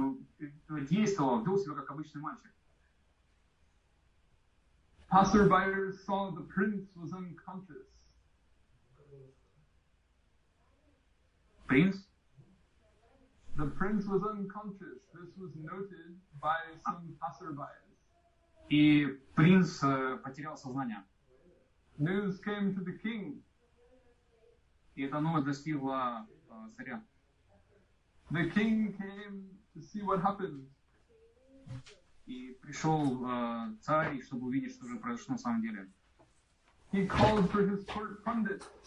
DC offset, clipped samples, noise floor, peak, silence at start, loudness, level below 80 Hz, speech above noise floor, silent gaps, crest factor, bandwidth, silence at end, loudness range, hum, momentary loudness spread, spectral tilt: under 0.1%; under 0.1%; -70 dBFS; -12 dBFS; 0 s; -33 LUFS; -58 dBFS; 38 dB; none; 22 dB; 10 kHz; 0.1 s; 10 LU; none; 22 LU; -7 dB/octave